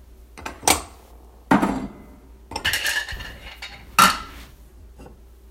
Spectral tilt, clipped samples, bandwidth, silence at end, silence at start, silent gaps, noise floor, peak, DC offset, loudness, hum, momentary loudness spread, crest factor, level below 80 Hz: -2.5 dB/octave; under 0.1%; 16.5 kHz; 0.05 s; 0.1 s; none; -46 dBFS; 0 dBFS; under 0.1%; -21 LUFS; none; 21 LU; 26 dB; -44 dBFS